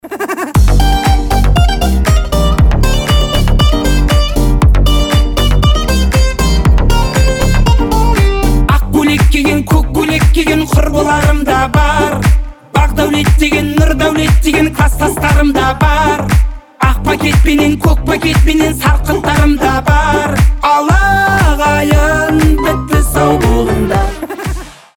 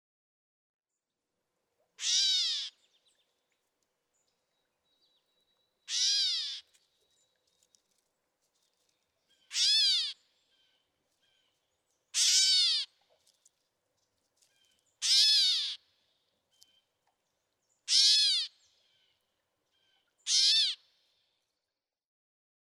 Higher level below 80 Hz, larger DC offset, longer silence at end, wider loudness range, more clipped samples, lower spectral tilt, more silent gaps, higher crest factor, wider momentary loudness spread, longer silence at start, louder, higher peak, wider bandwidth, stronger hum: first, -12 dBFS vs under -90 dBFS; neither; second, 0.25 s vs 1.9 s; second, 1 LU vs 6 LU; neither; first, -5.5 dB/octave vs 8 dB/octave; neither; second, 8 dB vs 22 dB; second, 3 LU vs 18 LU; second, 0.05 s vs 2 s; first, -11 LUFS vs -26 LUFS; first, 0 dBFS vs -12 dBFS; first, 18.5 kHz vs 16 kHz; neither